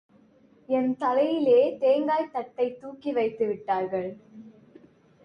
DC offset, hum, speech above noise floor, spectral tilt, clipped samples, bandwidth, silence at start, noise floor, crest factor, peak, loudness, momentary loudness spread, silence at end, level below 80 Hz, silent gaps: under 0.1%; none; 33 dB; -7.5 dB/octave; under 0.1%; 5.8 kHz; 0.7 s; -58 dBFS; 16 dB; -12 dBFS; -26 LUFS; 12 LU; 0.75 s; -74 dBFS; none